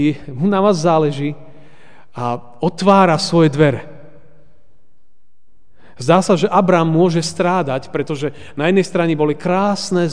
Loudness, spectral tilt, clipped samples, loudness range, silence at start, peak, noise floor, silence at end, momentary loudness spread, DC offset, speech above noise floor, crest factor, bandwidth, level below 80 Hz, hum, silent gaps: -16 LUFS; -6 dB/octave; under 0.1%; 3 LU; 0 s; 0 dBFS; -65 dBFS; 0 s; 11 LU; 2%; 49 dB; 16 dB; 10 kHz; -52 dBFS; none; none